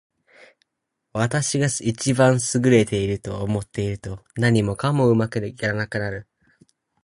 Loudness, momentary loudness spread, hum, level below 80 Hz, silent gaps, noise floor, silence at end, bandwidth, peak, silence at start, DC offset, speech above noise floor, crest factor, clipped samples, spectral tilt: -21 LUFS; 10 LU; none; -48 dBFS; none; -79 dBFS; 0.8 s; 11.5 kHz; -2 dBFS; 1.15 s; under 0.1%; 59 dB; 20 dB; under 0.1%; -5.5 dB/octave